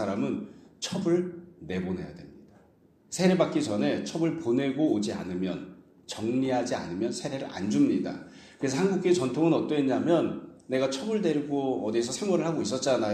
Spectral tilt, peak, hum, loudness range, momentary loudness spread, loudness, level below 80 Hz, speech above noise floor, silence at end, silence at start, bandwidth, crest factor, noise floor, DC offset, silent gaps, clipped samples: -5.5 dB/octave; -10 dBFS; none; 3 LU; 12 LU; -28 LUFS; -64 dBFS; 33 dB; 0 s; 0 s; 12.5 kHz; 18 dB; -60 dBFS; under 0.1%; none; under 0.1%